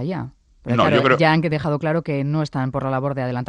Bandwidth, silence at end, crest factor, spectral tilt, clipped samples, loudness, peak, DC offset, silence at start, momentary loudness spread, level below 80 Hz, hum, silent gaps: 9.8 kHz; 0.05 s; 18 dB; -7.5 dB/octave; under 0.1%; -20 LUFS; -2 dBFS; under 0.1%; 0 s; 12 LU; -50 dBFS; none; none